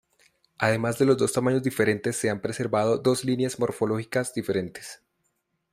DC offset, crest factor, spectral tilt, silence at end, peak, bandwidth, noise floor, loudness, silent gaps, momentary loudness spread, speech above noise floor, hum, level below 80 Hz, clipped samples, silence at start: under 0.1%; 20 dB; -5.5 dB/octave; 0.75 s; -6 dBFS; 15.5 kHz; -75 dBFS; -25 LUFS; none; 7 LU; 50 dB; none; -62 dBFS; under 0.1%; 0.6 s